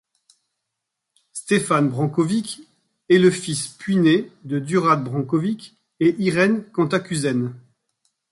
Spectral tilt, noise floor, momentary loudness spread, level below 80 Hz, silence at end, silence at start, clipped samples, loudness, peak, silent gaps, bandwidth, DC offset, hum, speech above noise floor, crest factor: -5.5 dB/octave; -81 dBFS; 11 LU; -64 dBFS; 0.7 s; 1.35 s; under 0.1%; -20 LUFS; -2 dBFS; none; 11.5 kHz; under 0.1%; none; 61 dB; 18 dB